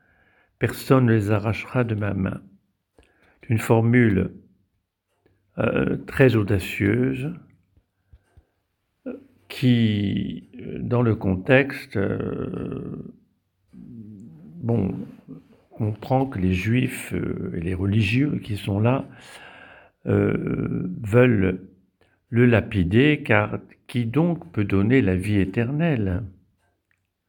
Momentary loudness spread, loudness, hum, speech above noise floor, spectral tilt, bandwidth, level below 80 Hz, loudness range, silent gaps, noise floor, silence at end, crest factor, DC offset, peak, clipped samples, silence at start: 20 LU; -22 LUFS; none; 52 dB; -7.5 dB/octave; 19.5 kHz; -48 dBFS; 6 LU; none; -74 dBFS; 0.95 s; 22 dB; under 0.1%; -2 dBFS; under 0.1%; 0.6 s